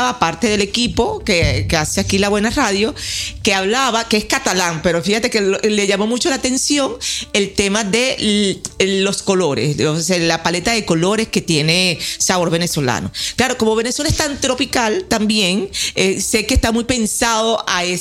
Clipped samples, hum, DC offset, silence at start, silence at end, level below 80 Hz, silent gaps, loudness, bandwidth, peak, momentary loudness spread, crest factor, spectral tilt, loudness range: under 0.1%; none; under 0.1%; 0 s; 0 s; -34 dBFS; none; -16 LUFS; 16.5 kHz; 0 dBFS; 3 LU; 16 dB; -3.5 dB/octave; 1 LU